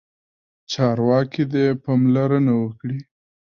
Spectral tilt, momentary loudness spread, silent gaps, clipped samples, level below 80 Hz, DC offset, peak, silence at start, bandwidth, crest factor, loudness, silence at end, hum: -7.5 dB/octave; 12 LU; none; under 0.1%; -60 dBFS; under 0.1%; -6 dBFS; 0.7 s; 7.2 kHz; 14 dB; -20 LUFS; 0.4 s; none